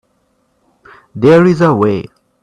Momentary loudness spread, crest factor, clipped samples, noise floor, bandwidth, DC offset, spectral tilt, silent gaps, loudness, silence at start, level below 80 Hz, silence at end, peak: 13 LU; 14 dB; under 0.1%; -60 dBFS; 9.6 kHz; under 0.1%; -8 dB/octave; none; -11 LUFS; 1.15 s; -50 dBFS; 0.4 s; 0 dBFS